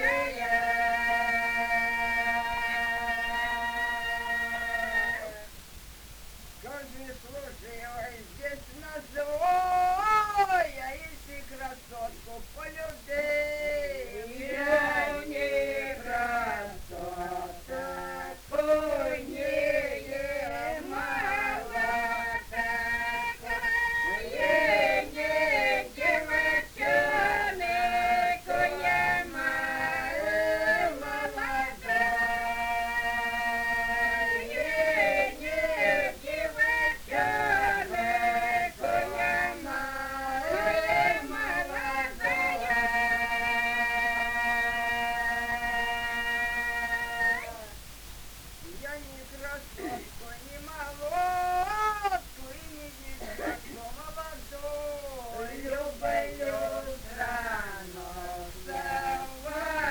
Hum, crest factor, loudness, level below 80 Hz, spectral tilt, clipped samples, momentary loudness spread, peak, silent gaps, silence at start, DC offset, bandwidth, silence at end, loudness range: none; 18 dB; -28 LUFS; -48 dBFS; -3 dB/octave; under 0.1%; 16 LU; -12 dBFS; none; 0 s; under 0.1%; over 20 kHz; 0 s; 8 LU